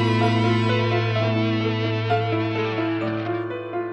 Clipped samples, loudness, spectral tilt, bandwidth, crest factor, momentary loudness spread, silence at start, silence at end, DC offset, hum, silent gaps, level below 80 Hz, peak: under 0.1%; -22 LUFS; -7.5 dB/octave; 8.4 kHz; 14 dB; 7 LU; 0 s; 0 s; under 0.1%; none; none; -56 dBFS; -8 dBFS